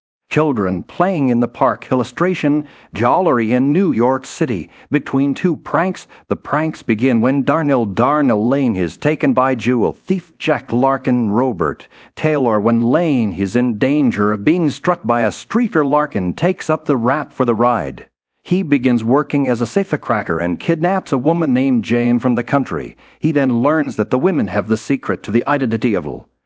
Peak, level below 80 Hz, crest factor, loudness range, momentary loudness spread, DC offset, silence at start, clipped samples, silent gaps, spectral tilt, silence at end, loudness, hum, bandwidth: 0 dBFS; -48 dBFS; 16 dB; 2 LU; 6 LU; under 0.1%; 0.3 s; under 0.1%; none; -7.5 dB/octave; 0.25 s; -16 LUFS; none; 8 kHz